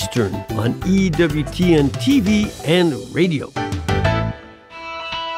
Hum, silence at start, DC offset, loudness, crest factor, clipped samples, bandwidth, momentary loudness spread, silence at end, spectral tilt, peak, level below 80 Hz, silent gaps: none; 0 s; under 0.1%; -18 LUFS; 16 dB; under 0.1%; 16 kHz; 12 LU; 0 s; -6 dB/octave; -4 dBFS; -36 dBFS; none